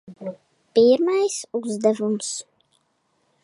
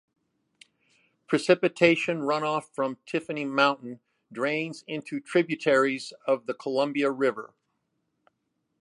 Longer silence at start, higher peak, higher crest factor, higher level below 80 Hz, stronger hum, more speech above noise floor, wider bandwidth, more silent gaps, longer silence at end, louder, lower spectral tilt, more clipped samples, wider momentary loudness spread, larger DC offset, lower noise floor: second, 0.1 s vs 1.3 s; about the same, -6 dBFS vs -4 dBFS; second, 18 dB vs 24 dB; about the same, -74 dBFS vs -78 dBFS; neither; about the same, 48 dB vs 51 dB; about the same, 11.5 kHz vs 11.5 kHz; neither; second, 1 s vs 1.35 s; first, -21 LUFS vs -26 LUFS; about the same, -4.5 dB/octave vs -5 dB/octave; neither; first, 18 LU vs 13 LU; neither; second, -69 dBFS vs -78 dBFS